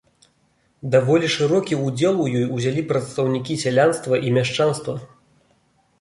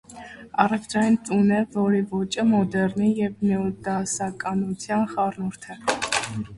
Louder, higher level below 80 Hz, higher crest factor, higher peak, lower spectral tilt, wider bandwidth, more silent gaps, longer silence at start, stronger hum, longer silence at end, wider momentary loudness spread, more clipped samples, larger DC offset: first, -20 LUFS vs -24 LUFS; about the same, -60 dBFS vs -56 dBFS; second, 16 dB vs 22 dB; about the same, -4 dBFS vs -2 dBFS; about the same, -5.5 dB/octave vs -5 dB/octave; about the same, 11.5 kHz vs 11.5 kHz; neither; first, 0.85 s vs 0.1 s; neither; first, 0.95 s vs 0 s; about the same, 6 LU vs 7 LU; neither; neither